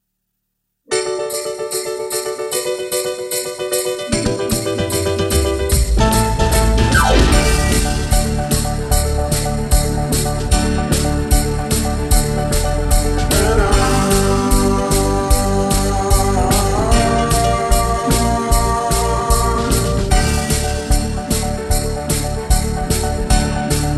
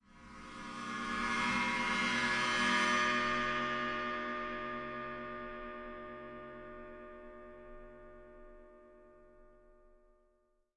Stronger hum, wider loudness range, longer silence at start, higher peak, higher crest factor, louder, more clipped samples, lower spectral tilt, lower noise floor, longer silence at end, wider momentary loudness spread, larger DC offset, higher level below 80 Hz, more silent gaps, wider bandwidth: neither; second, 4 LU vs 21 LU; first, 0.9 s vs 0.1 s; first, 0 dBFS vs -20 dBFS; about the same, 14 dB vs 18 dB; first, -17 LUFS vs -34 LUFS; neither; first, -4.5 dB/octave vs -3 dB/octave; about the same, -73 dBFS vs -75 dBFS; second, 0 s vs 0.9 s; second, 5 LU vs 23 LU; neither; first, -20 dBFS vs -60 dBFS; neither; first, 14 kHz vs 11.5 kHz